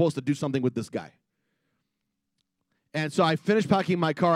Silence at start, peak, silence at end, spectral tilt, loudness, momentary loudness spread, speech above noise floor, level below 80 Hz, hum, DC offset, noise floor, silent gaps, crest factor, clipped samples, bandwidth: 0 s; -8 dBFS; 0 s; -6.5 dB/octave; -26 LUFS; 11 LU; 56 dB; -70 dBFS; none; under 0.1%; -81 dBFS; none; 20 dB; under 0.1%; 13 kHz